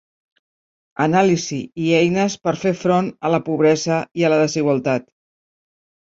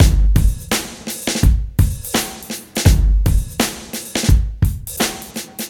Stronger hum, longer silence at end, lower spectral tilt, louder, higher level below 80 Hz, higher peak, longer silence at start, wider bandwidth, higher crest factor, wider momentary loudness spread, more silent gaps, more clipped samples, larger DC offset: neither; first, 1.15 s vs 0 s; about the same, -5.5 dB/octave vs -4.5 dB/octave; about the same, -18 LUFS vs -18 LUFS; second, -60 dBFS vs -18 dBFS; about the same, -2 dBFS vs 0 dBFS; first, 1 s vs 0 s; second, 7.8 kHz vs 18 kHz; about the same, 18 dB vs 16 dB; second, 6 LU vs 10 LU; first, 4.11-4.15 s vs none; neither; neither